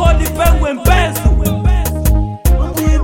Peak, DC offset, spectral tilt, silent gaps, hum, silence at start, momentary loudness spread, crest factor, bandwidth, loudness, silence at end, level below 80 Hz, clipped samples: 0 dBFS; under 0.1%; -5.5 dB/octave; none; none; 0 s; 3 LU; 12 dB; 17 kHz; -14 LUFS; 0 s; -14 dBFS; under 0.1%